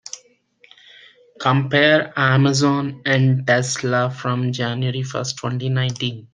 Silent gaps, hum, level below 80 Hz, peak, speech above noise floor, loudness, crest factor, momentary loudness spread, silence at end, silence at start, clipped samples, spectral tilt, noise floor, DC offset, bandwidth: none; none; -62 dBFS; -2 dBFS; 36 dB; -19 LUFS; 18 dB; 9 LU; 0.1 s; 0.15 s; under 0.1%; -5 dB/octave; -55 dBFS; under 0.1%; 9.6 kHz